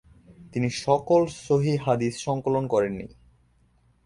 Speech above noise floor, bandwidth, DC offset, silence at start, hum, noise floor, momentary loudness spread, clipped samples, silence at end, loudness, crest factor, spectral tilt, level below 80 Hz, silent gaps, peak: 39 dB; 11.5 kHz; under 0.1%; 0.3 s; none; -63 dBFS; 9 LU; under 0.1%; 1 s; -25 LUFS; 18 dB; -6.5 dB/octave; -56 dBFS; none; -6 dBFS